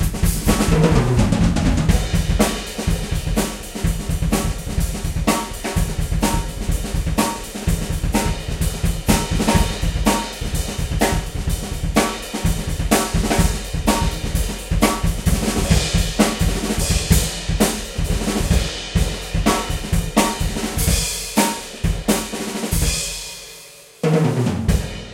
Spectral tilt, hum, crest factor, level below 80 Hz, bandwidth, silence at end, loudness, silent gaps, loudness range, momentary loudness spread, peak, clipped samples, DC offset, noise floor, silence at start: -4.5 dB/octave; none; 18 dB; -24 dBFS; 16 kHz; 0 s; -20 LUFS; none; 3 LU; 7 LU; 0 dBFS; under 0.1%; under 0.1%; -41 dBFS; 0 s